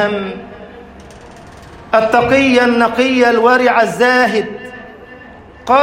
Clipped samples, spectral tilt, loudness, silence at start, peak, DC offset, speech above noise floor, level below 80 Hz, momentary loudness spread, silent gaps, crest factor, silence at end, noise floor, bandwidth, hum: under 0.1%; -4.5 dB/octave; -12 LUFS; 0 s; 0 dBFS; under 0.1%; 25 dB; -46 dBFS; 20 LU; none; 14 dB; 0 s; -37 dBFS; 16 kHz; none